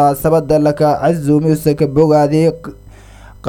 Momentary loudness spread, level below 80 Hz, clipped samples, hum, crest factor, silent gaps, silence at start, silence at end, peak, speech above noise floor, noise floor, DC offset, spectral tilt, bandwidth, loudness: 5 LU; -38 dBFS; under 0.1%; none; 14 dB; none; 0 s; 0 s; 0 dBFS; 25 dB; -37 dBFS; under 0.1%; -7.5 dB/octave; 17 kHz; -13 LUFS